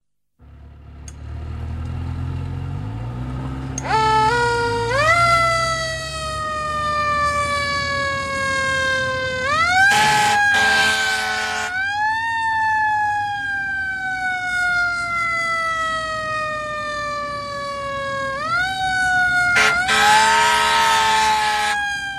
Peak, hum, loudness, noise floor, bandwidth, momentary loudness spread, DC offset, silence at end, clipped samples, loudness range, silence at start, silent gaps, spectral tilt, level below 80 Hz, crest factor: -2 dBFS; none; -18 LUFS; -51 dBFS; 16 kHz; 14 LU; under 0.1%; 0 s; under 0.1%; 7 LU; 0.4 s; none; -2.5 dB/octave; -40 dBFS; 18 dB